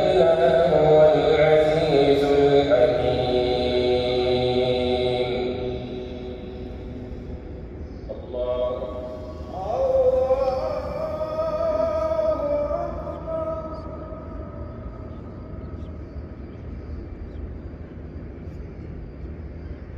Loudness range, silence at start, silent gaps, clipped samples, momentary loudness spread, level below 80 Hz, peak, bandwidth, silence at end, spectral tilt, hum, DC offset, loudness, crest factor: 18 LU; 0 s; none; under 0.1%; 20 LU; -38 dBFS; -4 dBFS; 9 kHz; 0 s; -7 dB/octave; none; under 0.1%; -21 LUFS; 20 dB